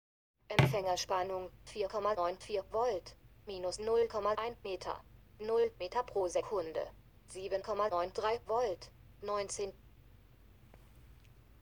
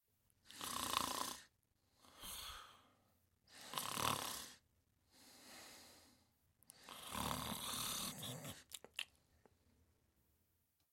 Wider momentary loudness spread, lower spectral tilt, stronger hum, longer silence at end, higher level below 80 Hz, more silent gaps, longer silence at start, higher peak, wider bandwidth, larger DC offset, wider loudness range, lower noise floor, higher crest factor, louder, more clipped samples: second, 14 LU vs 21 LU; first, -5 dB/octave vs -2 dB/octave; neither; second, 0.45 s vs 1.85 s; first, -60 dBFS vs -72 dBFS; neither; about the same, 0.5 s vs 0.45 s; first, -10 dBFS vs -16 dBFS; first, over 20 kHz vs 16.5 kHz; neither; about the same, 3 LU vs 3 LU; second, -61 dBFS vs -82 dBFS; second, 26 dB vs 34 dB; first, -36 LUFS vs -45 LUFS; neither